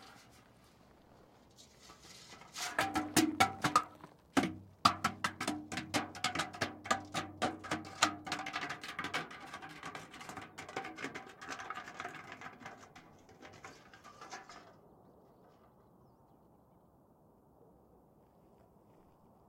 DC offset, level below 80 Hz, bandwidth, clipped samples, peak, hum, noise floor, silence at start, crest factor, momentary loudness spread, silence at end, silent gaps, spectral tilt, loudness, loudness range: under 0.1%; -72 dBFS; 16.5 kHz; under 0.1%; -10 dBFS; none; -66 dBFS; 0 s; 30 dB; 24 LU; 1.85 s; none; -3 dB/octave; -37 LUFS; 21 LU